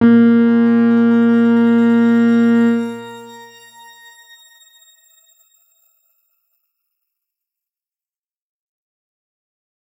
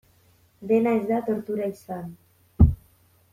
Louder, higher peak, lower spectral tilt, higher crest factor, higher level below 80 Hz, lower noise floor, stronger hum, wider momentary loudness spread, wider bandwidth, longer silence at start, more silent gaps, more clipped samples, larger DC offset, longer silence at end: first, -13 LUFS vs -24 LUFS; about the same, -2 dBFS vs -2 dBFS; second, -7.5 dB/octave vs -10 dB/octave; second, 16 dB vs 22 dB; second, -66 dBFS vs -34 dBFS; first, under -90 dBFS vs -60 dBFS; neither; second, 14 LU vs 18 LU; second, 7.8 kHz vs 14.5 kHz; second, 0 s vs 0.6 s; neither; neither; neither; first, 6.65 s vs 0.6 s